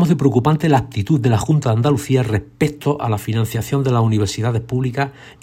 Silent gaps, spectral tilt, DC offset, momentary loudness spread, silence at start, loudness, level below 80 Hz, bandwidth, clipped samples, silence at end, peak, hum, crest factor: none; -7 dB/octave; under 0.1%; 6 LU; 0 s; -18 LUFS; -46 dBFS; 16 kHz; under 0.1%; 0.1 s; -2 dBFS; none; 16 dB